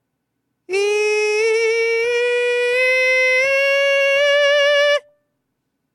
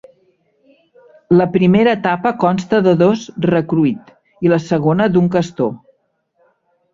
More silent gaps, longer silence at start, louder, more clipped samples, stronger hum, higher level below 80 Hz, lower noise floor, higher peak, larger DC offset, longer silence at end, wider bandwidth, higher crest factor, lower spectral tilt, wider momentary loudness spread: neither; second, 0.7 s vs 1.3 s; about the same, -16 LUFS vs -15 LUFS; neither; neither; second, -74 dBFS vs -54 dBFS; first, -74 dBFS vs -64 dBFS; second, -8 dBFS vs -2 dBFS; neither; second, 0.95 s vs 1.15 s; first, 14 kHz vs 7.6 kHz; about the same, 10 dB vs 14 dB; second, 0.5 dB/octave vs -7.5 dB/octave; second, 4 LU vs 8 LU